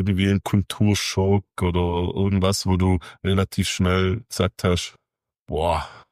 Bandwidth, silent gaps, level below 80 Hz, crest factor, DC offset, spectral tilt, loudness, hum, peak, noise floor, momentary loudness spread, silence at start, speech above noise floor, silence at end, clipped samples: 15.5 kHz; 5.41-5.46 s; -40 dBFS; 16 dB; under 0.1%; -5.5 dB/octave; -22 LUFS; none; -6 dBFS; -54 dBFS; 5 LU; 0 s; 33 dB; 0.15 s; under 0.1%